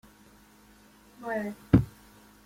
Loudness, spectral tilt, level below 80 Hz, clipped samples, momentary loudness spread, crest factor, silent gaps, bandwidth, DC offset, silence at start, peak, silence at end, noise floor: -28 LUFS; -8.5 dB/octave; -46 dBFS; under 0.1%; 16 LU; 26 dB; none; 16 kHz; under 0.1%; 1.2 s; -6 dBFS; 0.55 s; -57 dBFS